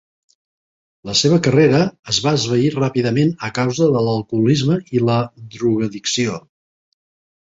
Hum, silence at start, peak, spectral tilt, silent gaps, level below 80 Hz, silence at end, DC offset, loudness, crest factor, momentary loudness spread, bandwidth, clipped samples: none; 1.05 s; -2 dBFS; -5.5 dB/octave; 1.99-2.03 s; -52 dBFS; 1.2 s; under 0.1%; -17 LUFS; 16 dB; 7 LU; 7.8 kHz; under 0.1%